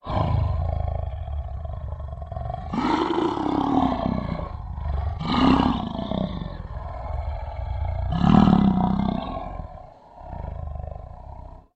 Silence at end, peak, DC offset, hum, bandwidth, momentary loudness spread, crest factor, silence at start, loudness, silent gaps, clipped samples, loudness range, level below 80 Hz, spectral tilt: 0.15 s; 0 dBFS; under 0.1%; none; 8.2 kHz; 18 LU; 24 dB; 0.05 s; -25 LUFS; none; under 0.1%; 4 LU; -32 dBFS; -8.5 dB/octave